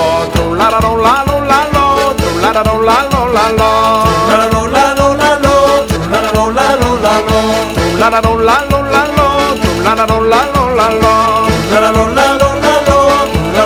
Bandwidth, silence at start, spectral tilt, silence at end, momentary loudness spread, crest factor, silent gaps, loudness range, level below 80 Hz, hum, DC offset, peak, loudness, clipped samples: 18 kHz; 0 s; -5 dB/octave; 0 s; 3 LU; 10 dB; none; 1 LU; -24 dBFS; none; under 0.1%; 0 dBFS; -10 LUFS; 0.2%